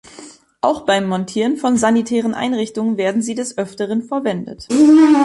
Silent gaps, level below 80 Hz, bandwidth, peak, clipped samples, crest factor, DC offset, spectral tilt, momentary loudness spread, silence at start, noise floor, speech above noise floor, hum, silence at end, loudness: none; -56 dBFS; 11.5 kHz; -2 dBFS; under 0.1%; 14 dB; under 0.1%; -5 dB/octave; 11 LU; 0.2 s; -40 dBFS; 25 dB; none; 0 s; -17 LUFS